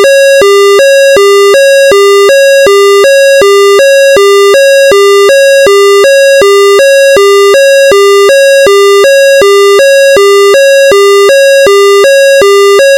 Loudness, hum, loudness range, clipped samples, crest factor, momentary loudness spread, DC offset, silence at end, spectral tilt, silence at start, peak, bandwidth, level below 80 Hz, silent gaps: -2 LUFS; none; 0 LU; under 0.1%; 0 dB; 0 LU; under 0.1%; 0 s; -1 dB/octave; 0 s; -2 dBFS; 17.5 kHz; -44 dBFS; none